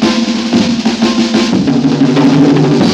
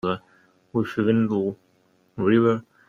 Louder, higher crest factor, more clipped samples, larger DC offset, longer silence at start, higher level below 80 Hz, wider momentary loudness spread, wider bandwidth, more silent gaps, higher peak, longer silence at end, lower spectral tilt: first, -10 LUFS vs -23 LUFS; second, 10 dB vs 18 dB; first, 0.4% vs under 0.1%; neither; about the same, 0 s vs 0.05 s; first, -42 dBFS vs -62 dBFS; second, 4 LU vs 13 LU; first, 10 kHz vs 7 kHz; neither; first, 0 dBFS vs -6 dBFS; second, 0 s vs 0.3 s; second, -5.5 dB/octave vs -8.5 dB/octave